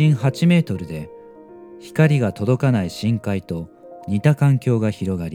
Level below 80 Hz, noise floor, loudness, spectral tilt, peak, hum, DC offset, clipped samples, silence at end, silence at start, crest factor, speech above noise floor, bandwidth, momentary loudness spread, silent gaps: -52 dBFS; -41 dBFS; -19 LUFS; -7.5 dB/octave; -2 dBFS; none; under 0.1%; under 0.1%; 0 s; 0 s; 18 dB; 23 dB; 13.5 kHz; 15 LU; none